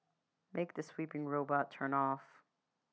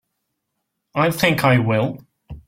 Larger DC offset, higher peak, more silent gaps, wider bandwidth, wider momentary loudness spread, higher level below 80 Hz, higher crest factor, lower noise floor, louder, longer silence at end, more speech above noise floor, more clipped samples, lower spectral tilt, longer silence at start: neither; second, -20 dBFS vs -2 dBFS; neither; second, 8 kHz vs 16.5 kHz; second, 8 LU vs 12 LU; second, under -90 dBFS vs -50 dBFS; about the same, 20 dB vs 18 dB; first, -85 dBFS vs -76 dBFS; second, -39 LUFS vs -18 LUFS; first, 0.7 s vs 0.1 s; second, 47 dB vs 59 dB; neither; first, -7.5 dB/octave vs -6 dB/octave; second, 0.55 s vs 0.95 s